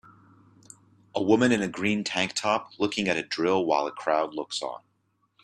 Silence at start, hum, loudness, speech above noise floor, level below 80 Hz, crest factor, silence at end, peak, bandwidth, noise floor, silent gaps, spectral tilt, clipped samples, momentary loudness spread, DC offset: 1.15 s; none; -26 LUFS; 46 dB; -66 dBFS; 20 dB; 0.65 s; -8 dBFS; 12 kHz; -72 dBFS; none; -4 dB/octave; under 0.1%; 10 LU; under 0.1%